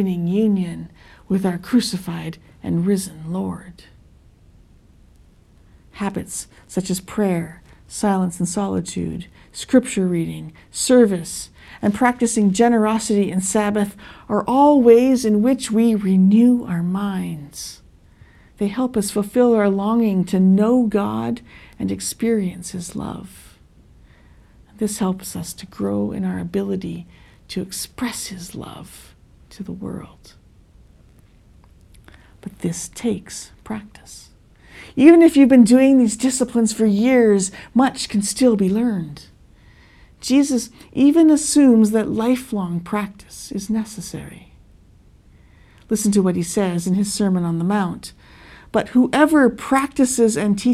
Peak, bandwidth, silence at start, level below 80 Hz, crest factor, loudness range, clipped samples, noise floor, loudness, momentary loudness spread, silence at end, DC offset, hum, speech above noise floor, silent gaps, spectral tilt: 0 dBFS; 14.5 kHz; 0 s; -50 dBFS; 20 dB; 15 LU; under 0.1%; -50 dBFS; -18 LUFS; 19 LU; 0 s; under 0.1%; none; 32 dB; none; -5.5 dB/octave